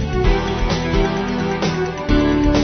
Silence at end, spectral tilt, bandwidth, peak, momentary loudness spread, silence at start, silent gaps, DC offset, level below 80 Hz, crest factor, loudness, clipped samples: 0 s; -6 dB/octave; 6.6 kHz; -4 dBFS; 5 LU; 0 s; none; under 0.1%; -22 dBFS; 14 dB; -19 LUFS; under 0.1%